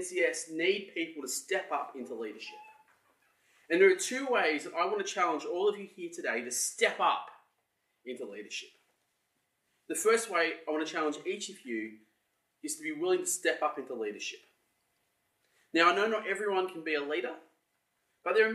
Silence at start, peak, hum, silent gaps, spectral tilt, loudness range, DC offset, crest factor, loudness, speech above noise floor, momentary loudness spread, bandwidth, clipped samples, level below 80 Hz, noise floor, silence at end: 0 s; -10 dBFS; none; none; -2 dB/octave; 5 LU; under 0.1%; 22 dB; -31 LUFS; 48 dB; 15 LU; 13.5 kHz; under 0.1%; under -90 dBFS; -79 dBFS; 0 s